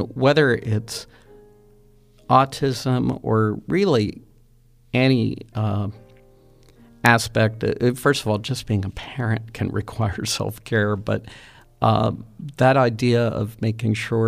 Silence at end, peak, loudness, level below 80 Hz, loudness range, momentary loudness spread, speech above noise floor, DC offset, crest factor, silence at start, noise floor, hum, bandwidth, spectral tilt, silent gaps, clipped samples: 0 s; 0 dBFS; -21 LUFS; -48 dBFS; 3 LU; 10 LU; 33 dB; under 0.1%; 22 dB; 0 s; -54 dBFS; none; 15.5 kHz; -6 dB/octave; none; under 0.1%